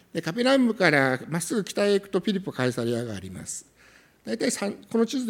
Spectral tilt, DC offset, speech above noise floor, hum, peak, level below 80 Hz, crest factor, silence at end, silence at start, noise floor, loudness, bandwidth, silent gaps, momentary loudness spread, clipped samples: -4.5 dB/octave; under 0.1%; 31 dB; none; -4 dBFS; -66 dBFS; 22 dB; 0 s; 0.15 s; -56 dBFS; -25 LUFS; 17 kHz; none; 15 LU; under 0.1%